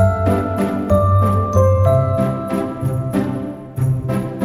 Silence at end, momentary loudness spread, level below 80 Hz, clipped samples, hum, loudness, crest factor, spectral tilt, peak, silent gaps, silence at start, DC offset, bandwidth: 0 s; 8 LU; -34 dBFS; under 0.1%; none; -17 LUFS; 14 dB; -9 dB/octave; -2 dBFS; none; 0 s; under 0.1%; 13 kHz